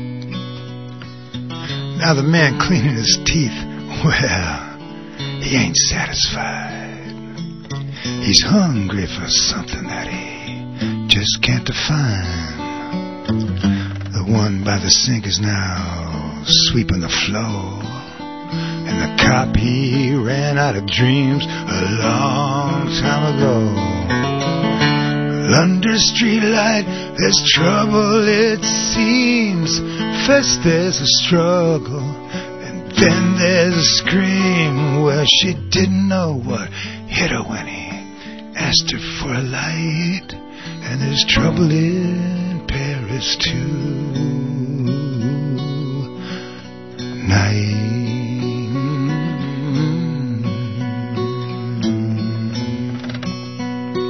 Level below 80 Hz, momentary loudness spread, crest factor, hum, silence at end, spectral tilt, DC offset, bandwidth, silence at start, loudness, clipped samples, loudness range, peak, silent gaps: -38 dBFS; 15 LU; 18 dB; none; 0 s; -4 dB/octave; 0.5%; 6.4 kHz; 0 s; -17 LUFS; under 0.1%; 7 LU; 0 dBFS; none